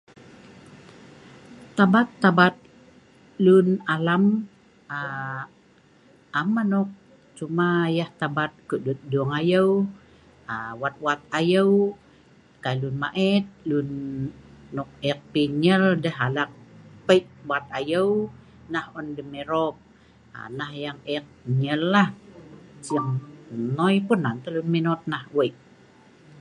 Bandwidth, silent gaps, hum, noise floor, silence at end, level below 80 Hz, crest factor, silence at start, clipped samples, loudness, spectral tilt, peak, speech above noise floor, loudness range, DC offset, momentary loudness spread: 11 kHz; none; none; -56 dBFS; 0.9 s; -62 dBFS; 22 dB; 0.7 s; under 0.1%; -24 LUFS; -7 dB/octave; -4 dBFS; 33 dB; 6 LU; under 0.1%; 15 LU